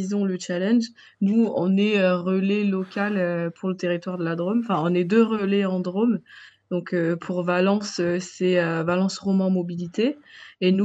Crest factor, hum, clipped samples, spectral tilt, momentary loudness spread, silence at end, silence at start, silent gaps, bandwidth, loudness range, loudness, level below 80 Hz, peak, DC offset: 16 dB; none; under 0.1%; -6.5 dB/octave; 6 LU; 0 s; 0 s; none; 8 kHz; 2 LU; -23 LUFS; -72 dBFS; -6 dBFS; under 0.1%